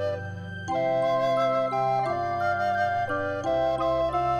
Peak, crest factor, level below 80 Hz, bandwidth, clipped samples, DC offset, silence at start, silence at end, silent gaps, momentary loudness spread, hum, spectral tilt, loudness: -14 dBFS; 10 dB; -52 dBFS; 9.2 kHz; under 0.1%; under 0.1%; 0 s; 0 s; none; 7 LU; none; -6.5 dB/octave; -26 LUFS